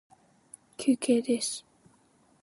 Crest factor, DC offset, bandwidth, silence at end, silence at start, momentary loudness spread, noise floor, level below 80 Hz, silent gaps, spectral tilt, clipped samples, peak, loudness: 18 dB; under 0.1%; 11.5 kHz; 0.85 s; 0.8 s; 14 LU; -65 dBFS; -78 dBFS; none; -3.5 dB/octave; under 0.1%; -12 dBFS; -28 LUFS